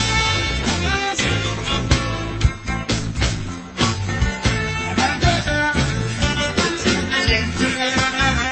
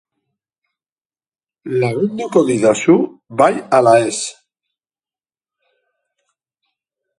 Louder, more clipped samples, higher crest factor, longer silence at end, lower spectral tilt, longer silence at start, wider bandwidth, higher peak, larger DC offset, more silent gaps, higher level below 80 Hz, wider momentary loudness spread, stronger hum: second, -19 LUFS vs -15 LUFS; neither; about the same, 18 dB vs 18 dB; second, 0 s vs 2.9 s; second, -4 dB/octave vs -5.5 dB/octave; second, 0 s vs 1.65 s; second, 8.8 kHz vs 11.5 kHz; about the same, -2 dBFS vs 0 dBFS; neither; neither; first, -28 dBFS vs -62 dBFS; second, 5 LU vs 11 LU; neither